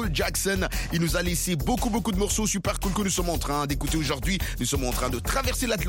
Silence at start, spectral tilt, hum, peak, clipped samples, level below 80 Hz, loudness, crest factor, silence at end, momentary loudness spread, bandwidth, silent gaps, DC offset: 0 s; -4 dB/octave; none; -12 dBFS; under 0.1%; -32 dBFS; -26 LUFS; 14 dB; 0 s; 2 LU; 17 kHz; none; under 0.1%